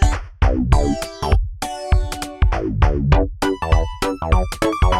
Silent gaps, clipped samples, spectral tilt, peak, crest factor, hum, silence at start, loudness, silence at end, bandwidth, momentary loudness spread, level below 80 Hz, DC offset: none; under 0.1%; -6 dB/octave; 0 dBFS; 18 dB; none; 0 s; -20 LUFS; 0 s; 13.5 kHz; 5 LU; -20 dBFS; under 0.1%